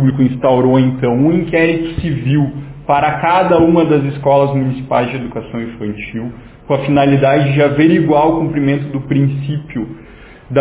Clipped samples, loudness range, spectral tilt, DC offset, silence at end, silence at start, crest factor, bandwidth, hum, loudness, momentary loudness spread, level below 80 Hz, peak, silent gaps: under 0.1%; 3 LU; -11.5 dB/octave; under 0.1%; 0 s; 0 s; 12 dB; 4 kHz; none; -14 LUFS; 13 LU; -38 dBFS; 0 dBFS; none